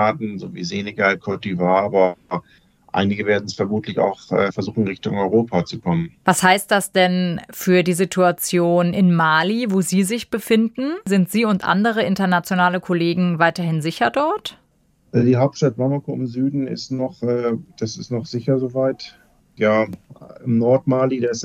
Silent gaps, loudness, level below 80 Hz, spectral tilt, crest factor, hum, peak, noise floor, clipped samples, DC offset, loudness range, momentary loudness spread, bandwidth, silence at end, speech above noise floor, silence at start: none; -19 LUFS; -60 dBFS; -5.5 dB/octave; 18 dB; none; -2 dBFS; -59 dBFS; under 0.1%; under 0.1%; 5 LU; 10 LU; 16 kHz; 0 s; 41 dB; 0 s